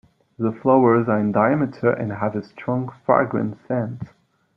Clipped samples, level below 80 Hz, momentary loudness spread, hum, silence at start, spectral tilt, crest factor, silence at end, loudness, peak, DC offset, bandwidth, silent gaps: under 0.1%; -60 dBFS; 10 LU; none; 0.4 s; -11 dB/octave; 18 dB; 0.5 s; -21 LUFS; -2 dBFS; under 0.1%; 5.8 kHz; none